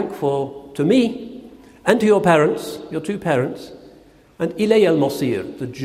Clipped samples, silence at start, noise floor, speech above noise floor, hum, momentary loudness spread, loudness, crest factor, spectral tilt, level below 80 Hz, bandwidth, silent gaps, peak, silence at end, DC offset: under 0.1%; 0 s; -48 dBFS; 30 dB; none; 15 LU; -19 LUFS; 20 dB; -6 dB/octave; -56 dBFS; 15.5 kHz; none; 0 dBFS; 0 s; under 0.1%